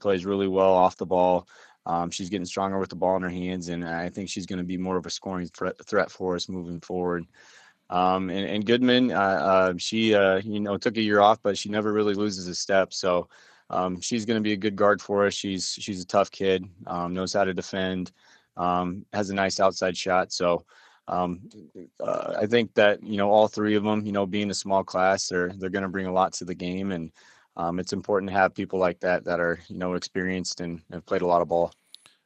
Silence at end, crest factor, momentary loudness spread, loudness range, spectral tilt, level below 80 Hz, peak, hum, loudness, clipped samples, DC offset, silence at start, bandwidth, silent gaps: 0.55 s; 22 dB; 11 LU; 6 LU; -4.5 dB/octave; -64 dBFS; -4 dBFS; none; -25 LUFS; under 0.1%; under 0.1%; 0 s; 9.2 kHz; none